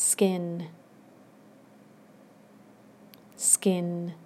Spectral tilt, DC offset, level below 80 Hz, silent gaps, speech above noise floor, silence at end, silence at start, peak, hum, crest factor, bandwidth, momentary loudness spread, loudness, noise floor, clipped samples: -4 dB/octave; under 0.1%; -86 dBFS; none; 27 dB; 0 s; 0 s; -4 dBFS; none; 26 dB; 16 kHz; 16 LU; -26 LUFS; -55 dBFS; under 0.1%